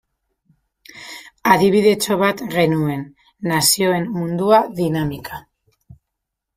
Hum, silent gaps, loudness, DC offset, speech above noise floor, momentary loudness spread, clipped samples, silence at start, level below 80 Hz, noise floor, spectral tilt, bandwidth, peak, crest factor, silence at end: none; none; -17 LUFS; under 0.1%; 63 dB; 20 LU; under 0.1%; 0.95 s; -54 dBFS; -80 dBFS; -4.5 dB/octave; 16 kHz; 0 dBFS; 20 dB; 1.15 s